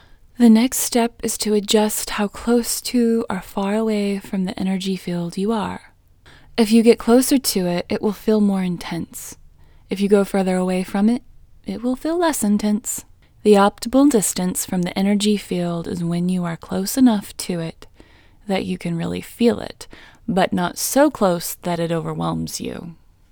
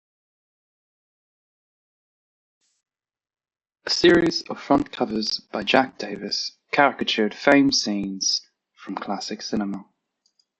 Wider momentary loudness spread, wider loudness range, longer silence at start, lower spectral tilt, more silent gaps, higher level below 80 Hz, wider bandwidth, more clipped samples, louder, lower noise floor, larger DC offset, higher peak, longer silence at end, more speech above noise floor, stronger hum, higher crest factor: about the same, 13 LU vs 13 LU; about the same, 4 LU vs 4 LU; second, 0.4 s vs 3.85 s; first, -5 dB/octave vs -3.5 dB/octave; neither; first, -48 dBFS vs -58 dBFS; first, over 20 kHz vs 8.4 kHz; neither; first, -19 LUFS vs -22 LUFS; second, -49 dBFS vs -71 dBFS; neither; about the same, 0 dBFS vs -2 dBFS; second, 0.4 s vs 0.75 s; second, 30 dB vs 49 dB; neither; about the same, 20 dB vs 24 dB